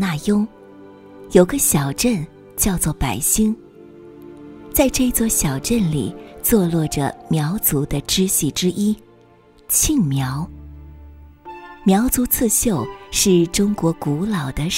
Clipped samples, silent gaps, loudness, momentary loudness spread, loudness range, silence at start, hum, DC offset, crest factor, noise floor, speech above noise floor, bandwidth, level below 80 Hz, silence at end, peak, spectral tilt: under 0.1%; none; -18 LUFS; 13 LU; 2 LU; 0 s; none; under 0.1%; 20 dB; -50 dBFS; 31 dB; 16.5 kHz; -36 dBFS; 0 s; 0 dBFS; -4.5 dB/octave